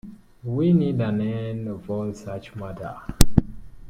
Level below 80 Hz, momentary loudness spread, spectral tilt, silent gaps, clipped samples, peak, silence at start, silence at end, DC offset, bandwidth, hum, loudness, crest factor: -32 dBFS; 15 LU; -6.5 dB/octave; none; under 0.1%; 0 dBFS; 0.05 s; 0 s; under 0.1%; 16.5 kHz; none; -25 LUFS; 22 dB